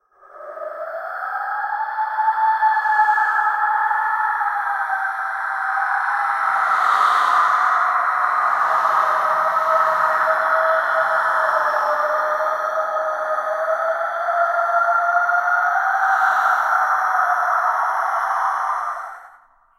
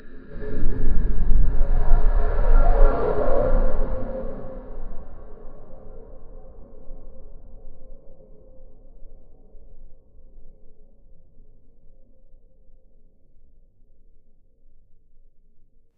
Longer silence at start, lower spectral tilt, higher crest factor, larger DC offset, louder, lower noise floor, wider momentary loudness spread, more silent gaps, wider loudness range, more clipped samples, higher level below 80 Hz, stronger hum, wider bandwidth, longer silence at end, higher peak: first, 0.35 s vs 0.05 s; second, -1 dB/octave vs -11 dB/octave; about the same, 14 dB vs 18 dB; neither; first, -18 LUFS vs -26 LUFS; about the same, -51 dBFS vs -49 dBFS; second, 7 LU vs 27 LU; neither; second, 3 LU vs 25 LU; neither; second, -72 dBFS vs -22 dBFS; neither; first, 16 kHz vs 2.1 kHz; second, 0.5 s vs 5.25 s; about the same, -4 dBFS vs -2 dBFS